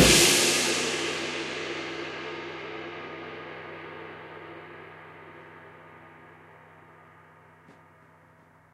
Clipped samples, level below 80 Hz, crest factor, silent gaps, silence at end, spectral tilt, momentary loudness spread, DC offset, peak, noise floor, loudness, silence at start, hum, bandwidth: under 0.1%; -50 dBFS; 24 dB; none; 1 s; -2 dB/octave; 27 LU; under 0.1%; -6 dBFS; -57 dBFS; -25 LUFS; 0 s; none; 15.5 kHz